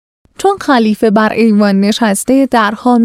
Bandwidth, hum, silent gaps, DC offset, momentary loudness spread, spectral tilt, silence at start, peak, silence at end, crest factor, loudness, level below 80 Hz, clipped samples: 15.5 kHz; none; none; under 0.1%; 4 LU; -5 dB/octave; 0.4 s; 0 dBFS; 0 s; 10 dB; -11 LUFS; -48 dBFS; under 0.1%